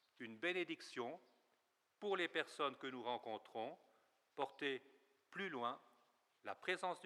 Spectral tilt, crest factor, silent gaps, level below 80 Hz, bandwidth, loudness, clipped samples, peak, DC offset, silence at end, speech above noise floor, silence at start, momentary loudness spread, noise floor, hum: -4 dB/octave; 24 dB; none; under -90 dBFS; 13 kHz; -46 LUFS; under 0.1%; -24 dBFS; under 0.1%; 0 s; 37 dB; 0.2 s; 13 LU; -83 dBFS; none